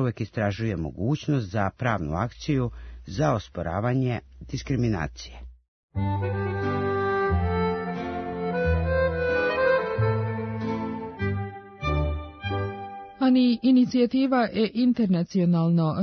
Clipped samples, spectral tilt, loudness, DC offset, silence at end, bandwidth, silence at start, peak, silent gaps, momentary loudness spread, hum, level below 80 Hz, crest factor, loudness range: under 0.1%; -7.5 dB/octave; -25 LUFS; under 0.1%; 0 s; 6.6 kHz; 0 s; -8 dBFS; 5.68-5.89 s; 11 LU; none; -42 dBFS; 16 dB; 6 LU